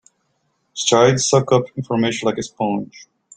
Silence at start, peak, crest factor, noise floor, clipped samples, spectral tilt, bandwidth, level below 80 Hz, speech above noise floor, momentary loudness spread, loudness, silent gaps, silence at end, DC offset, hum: 0.75 s; -2 dBFS; 18 dB; -68 dBFS; under 0.1%; -4.5 dB/octave; 9.6 kHz; -56 dBFS; 50 dB; 11 LU; -18 LUFS; none; 0.4 s; under 0.1%; none